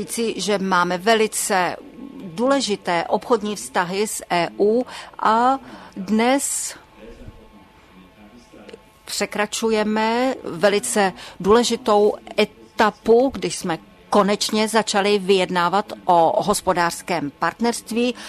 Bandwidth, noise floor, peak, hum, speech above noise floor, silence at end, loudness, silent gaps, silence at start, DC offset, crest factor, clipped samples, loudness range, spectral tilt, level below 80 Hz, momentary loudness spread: 13.5 kHz; -48 dBFS; -4 dBFS; none; 28 dB; 0 s; -20 LUFS; none; 0 s; under 0.1%; 16 dB; under 0.1%; 7 LU; -3.5 dB/octave; -54 dBFS; 8 LU